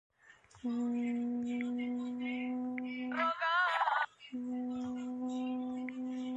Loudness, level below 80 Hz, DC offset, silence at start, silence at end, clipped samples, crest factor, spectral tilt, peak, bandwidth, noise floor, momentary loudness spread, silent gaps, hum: -36 LUFS; -78 dBFS; under 0.1%; 0.3 s; 0 s; under 0.1%; 16 dB; -4.5 dB/octave; -20 dBFS; 7.8 kHz; -62 dBFS; 9 LU; none; none